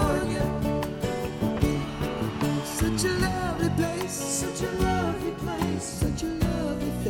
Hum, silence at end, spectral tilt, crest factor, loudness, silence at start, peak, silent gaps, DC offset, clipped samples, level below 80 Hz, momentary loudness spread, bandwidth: none; 0 s; -5 dB/octave; 18 dB; -28 LUFS; 0 s; -8 dBFS; none; under 0.1%; under 0.1%; -38 dBFS; 4 LU; 17.5 kHz